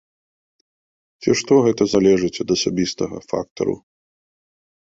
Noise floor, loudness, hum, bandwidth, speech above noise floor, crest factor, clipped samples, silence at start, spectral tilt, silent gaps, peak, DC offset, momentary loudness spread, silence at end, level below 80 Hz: under -90 dBFS; -19 LUFS; none; 8 kHz; over 72 dB; 18 dB; under 0.1%; 1.2 s; -5 dB/octave; 3.51-3.56 s; -2 dBFS; under 0.1%; 11 LU; 1.1 s; -52 dBFS